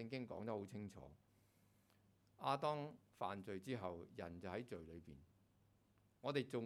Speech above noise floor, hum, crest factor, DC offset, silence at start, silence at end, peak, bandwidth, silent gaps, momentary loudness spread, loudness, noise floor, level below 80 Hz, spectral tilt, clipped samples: 29 dB; none; 22 dB; under 0.1%; 0 s; 0 s; -26 dBFS; 15.5 kHz; none; 16 LU; -48 LUFS; -77 dBFS; -76 dBFS; -6.5 dB/octave; under 0.1%